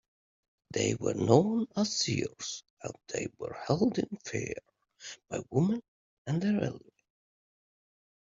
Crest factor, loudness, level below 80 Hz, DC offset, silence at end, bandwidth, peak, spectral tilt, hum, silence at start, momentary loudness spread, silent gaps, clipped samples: 26 dB; -31 LUFS; -66 dBFS; under 0.1%; 1.45 s; 7.8 kHz; -8 dBFS; -5 dB/octave; none; 0.7 s; 18 LU; 2.70-2.77 s, 5.88-6.25 s; under 0.1%